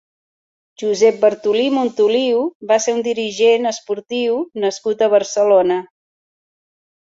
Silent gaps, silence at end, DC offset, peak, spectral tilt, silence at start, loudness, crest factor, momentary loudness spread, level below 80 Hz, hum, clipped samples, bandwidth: 2.55-2.60 s; 1.2 s; under 0.1%; -2 dBFS; -3.5 dB/octave; 0.8 s; -17 LUFS; 16 dB; 8 LU; -66 dBFS; none; under 0.1%; 7.8 kHz